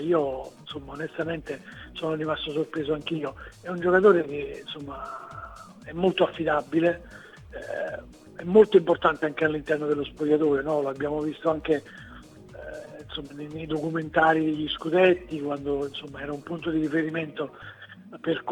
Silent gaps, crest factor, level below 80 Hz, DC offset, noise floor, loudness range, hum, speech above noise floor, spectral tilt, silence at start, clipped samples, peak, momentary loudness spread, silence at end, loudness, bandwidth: none; 22 dB; -54 dBFS; under 0.1%; -46 dBFS; 7 LU; none; 20 dB; -7 dB/octave; 0 s; under 0.1%; -4 dBFS; 20 LU; 0 s; -26 LUFS; 10.5 kHz